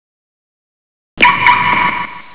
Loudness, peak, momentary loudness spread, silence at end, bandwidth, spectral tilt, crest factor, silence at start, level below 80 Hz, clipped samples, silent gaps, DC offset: -10 LUFS; 0 dBFS; 8 LU; 0 s; 4 kHz; -6.5 dB/octave; 16 dB; 1.15 s; -44 dBFS; 0.2%; none; 3%